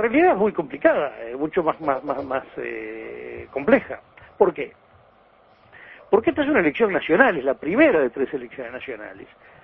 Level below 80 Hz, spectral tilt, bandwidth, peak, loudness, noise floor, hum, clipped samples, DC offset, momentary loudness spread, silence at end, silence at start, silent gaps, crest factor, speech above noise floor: -56 dBFS; -9.5 dB/octave; 5.4 kHz; 0 dBFS; -21 LUFS; -55 dBFS; none; under 0.1%; under 0.1%; 17 LU; 0.4 s; 0 s; none; 22 dB; 33 dB